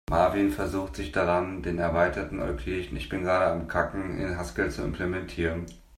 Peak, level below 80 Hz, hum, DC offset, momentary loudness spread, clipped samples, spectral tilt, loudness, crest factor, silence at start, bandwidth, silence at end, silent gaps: -10 dBFS; -42 dBFS; none; under 0.1%; 7 LU; under 0.1%; -6.5 dB/octave; -28 LUFS; 18 dB; 0.1 s; 16 kHz; 0.15 s; none